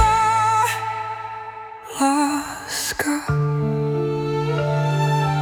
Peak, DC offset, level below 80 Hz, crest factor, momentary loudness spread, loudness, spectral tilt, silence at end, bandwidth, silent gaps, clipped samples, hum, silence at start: -2 dBFS; under 0.1%; -42 dBFS; 18 dB; 13 LU; -21 LUFS; -5 dB/octave; 0 s; 19 kHz; none; under 0.1%; none; 0 s